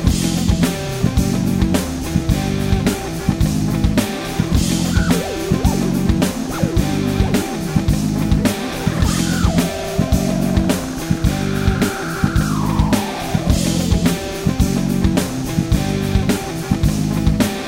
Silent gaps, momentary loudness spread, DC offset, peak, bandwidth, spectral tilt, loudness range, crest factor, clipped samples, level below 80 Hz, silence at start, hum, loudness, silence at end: none; 4 LU; under 0.1%; -2 dBFS; 16.5 kHz; -5.5 dB/octave; 1 LU; 16 dB; under 0.1%; -24 dBFS; 0 s; none; -18 LUFS; 0 s